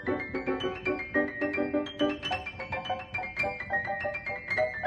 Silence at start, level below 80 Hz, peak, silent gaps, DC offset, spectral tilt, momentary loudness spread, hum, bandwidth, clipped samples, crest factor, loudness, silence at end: 0 s; -56 dBFS; -14 dBFS; none; under 0.1%; -5.5 dB/octave; 5 LU; none; 10.5 kHz; under 0.1%; 18 dB; -31 LUFS; 0 s